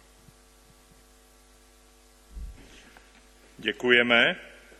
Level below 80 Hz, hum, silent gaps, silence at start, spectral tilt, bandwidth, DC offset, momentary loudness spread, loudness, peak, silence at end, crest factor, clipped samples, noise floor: -52 dBFS; none; none; 2.35 s; -4 dB/octave; 13.5 kHz; under 0.1%; 27 LU; -22 LUFS; -4 dBFS; 0.35 s; 26 dB; under 0.1%; -57 dBFS